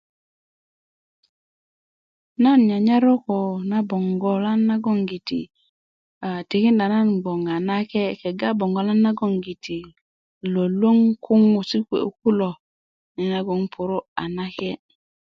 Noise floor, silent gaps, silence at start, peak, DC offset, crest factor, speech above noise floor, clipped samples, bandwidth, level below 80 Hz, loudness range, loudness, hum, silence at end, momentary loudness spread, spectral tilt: under -90 dBFS; 5.69-6.21 s, 10.01-10.41 s, 12.60-13.15 s, 14.08-14.16 s; 2.4 s; -6 dBFS; under 0.1%; 16 dB; over 70 dB; under 0.1%; 6.2 kHz; -64 dBFS; 4 LU; -21 LUFS; none; 0.45 s; 13 LU; -8 dB/octave